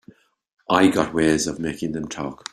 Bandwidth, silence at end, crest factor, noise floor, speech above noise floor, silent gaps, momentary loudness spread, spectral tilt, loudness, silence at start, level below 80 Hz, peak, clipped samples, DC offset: 13 kHz; 0.15 s; 20 dB; -52 dBFS; 31 dB; none; 12 LU; -4.5 dB/octave; -21 LUFS; 0.7 s; -52 dBFS; -2 dBFS; under 0.1%; under 0.1%